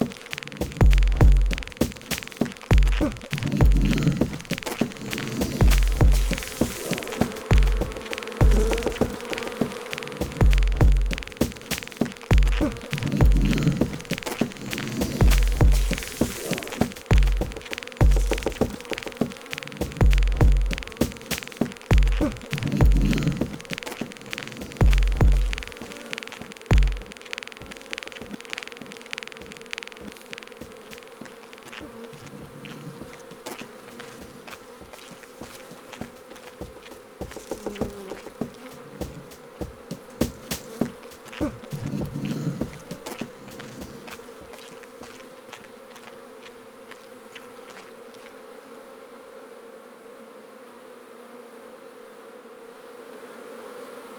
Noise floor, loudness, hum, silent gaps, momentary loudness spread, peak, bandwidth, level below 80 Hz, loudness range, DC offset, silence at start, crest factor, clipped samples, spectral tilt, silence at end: -45 dBFS; -25 LUFS; none; none; 23 LU; -6 dBFS; over 20 kHz; -26 dBFS; 20 LU; under 0.1%; 0 s; 18 dB; under 0.1%; -5.5 dB/octave; 0 s